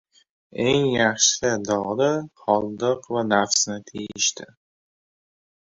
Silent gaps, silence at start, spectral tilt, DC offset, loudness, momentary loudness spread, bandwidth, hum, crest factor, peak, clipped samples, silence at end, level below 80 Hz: none; 0.55 s; -2.5 dB/octave; under 0.1%; -22 LUFS; 9 LU; 8 kHz; none; 20 dB; -4 dBFS; under 0.1%; 1.3 s; -58 dBFS